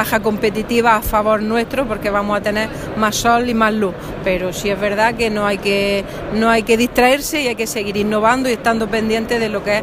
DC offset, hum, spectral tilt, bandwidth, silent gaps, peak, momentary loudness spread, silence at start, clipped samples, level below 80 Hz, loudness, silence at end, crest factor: under 0.1%; none; -4 dB/octave; 15.5 kHz; none; 0 dBFS; 6 LU; 0 s; under 0.1%; -36 dBFS; -17 LUFS; 0 s; 16 dB